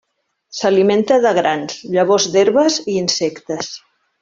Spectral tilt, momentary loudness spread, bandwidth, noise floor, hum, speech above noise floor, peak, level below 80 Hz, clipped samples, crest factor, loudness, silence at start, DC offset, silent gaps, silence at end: -3.5 dB/octave; 12 LU; 7.6 kHz; -57 dBFS; none; 41 dB; -2 dBFS; -60 dBFS; under 0.1%; 14 dB; -16 LUFS; 0.55 s; under 0.1%; none; 0.45 s